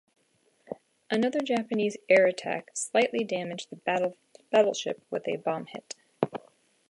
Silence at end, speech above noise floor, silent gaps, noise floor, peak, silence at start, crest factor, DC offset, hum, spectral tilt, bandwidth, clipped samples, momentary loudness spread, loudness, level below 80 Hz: 0.55 s; 42 dB; none; -69 dBFS; -6 dBFS; 0.7 s; 22 dB; under 0.1%; none; -4 dB/octave; 11.5 kHz; under 0.1%; 19 LU; -28 LUFS; -80 dBFS